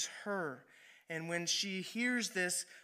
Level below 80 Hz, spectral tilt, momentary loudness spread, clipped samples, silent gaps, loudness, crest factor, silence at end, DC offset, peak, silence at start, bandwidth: -90 dBFS; -2 dB/octave; 10 LU; under 0.1%; none; -37 LUFS; 18 dB; 0 s; under 0.1%; -20 dBFS; 0 s; 15.5 kHz